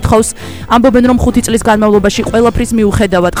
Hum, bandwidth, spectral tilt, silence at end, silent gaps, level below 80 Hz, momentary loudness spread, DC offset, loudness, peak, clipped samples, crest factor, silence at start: none; over 20 kHz; -5.5 dB/octave; 0 s; none; -24 dBFS; 4 LU; 2%; -10 LUFS; 0 dBFS; 0.2%; 10 dB; 0 s